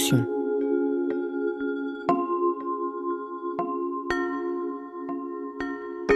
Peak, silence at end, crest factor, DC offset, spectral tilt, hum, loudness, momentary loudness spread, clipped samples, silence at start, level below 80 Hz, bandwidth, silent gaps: -8 dBFS; 0 s; 18 dB; under 0.1%; -5.5 dB/octave; none; -28 LUFS; 8 LU; under 0.1%; 0 s; -56 dBFS; 15 kHz; none